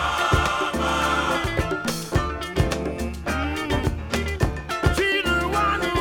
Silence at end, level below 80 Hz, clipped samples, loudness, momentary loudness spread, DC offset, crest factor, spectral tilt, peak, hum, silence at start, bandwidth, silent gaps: 0 s; -32 dBFS; under 0.1%; -23 LUFS; 6 LU; under 0.1%; 18 dB; -5 dB/octave; -6 dBFS; none; 0 s; 19 kHz; none